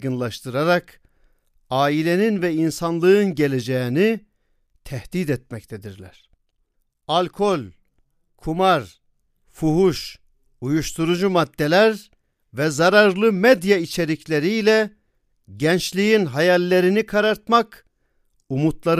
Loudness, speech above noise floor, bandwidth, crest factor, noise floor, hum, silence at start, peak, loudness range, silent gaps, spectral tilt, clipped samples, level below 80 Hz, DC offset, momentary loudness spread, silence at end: -19 LUFS; 49 dB; 15.5 kHz; 20 dB; -68 dBFS; none; 0 s; 0 dBFS; 8 LU; none; -5.5 dB/octave; under 0.1%; -50 dBFS; under 0.1%; 15 LU; 0 s